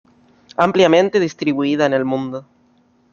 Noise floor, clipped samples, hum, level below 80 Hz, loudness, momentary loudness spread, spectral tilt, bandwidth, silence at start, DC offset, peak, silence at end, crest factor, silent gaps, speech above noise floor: -56 dBFS; under 0.1%; none; -60 dBFS; -16 LUFS; 15 LU; -5.5 dB/octave; 7.4 kHz; 0.6 s; under 0.1%; 0 dBFS; 0.7 s; 18 dB; none; 41 dB